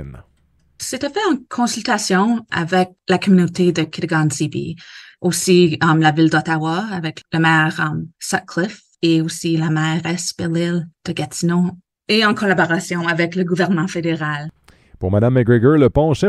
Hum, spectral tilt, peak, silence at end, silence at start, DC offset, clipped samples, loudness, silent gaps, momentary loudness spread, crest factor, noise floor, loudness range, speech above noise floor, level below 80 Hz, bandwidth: none; -5.5 dB/octave; -2 dBFS; 0 s; 0 s; under 0.1%; under 0.1%; -17 LUFS; none; 11 LU; 16 dB; -44 dBFS; 3 LU; 27 dB; -46 dBFS; 12.5 kHz